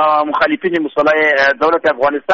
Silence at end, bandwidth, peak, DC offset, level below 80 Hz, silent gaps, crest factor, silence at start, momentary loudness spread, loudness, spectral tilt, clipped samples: 0 s; 7 kHz; -2 dBFS; under 0.1%; -52 dBFS; none; 10 dB; 0 s; 5 LU; -13 LUFS; -1.5 dB/octave; under 0.1%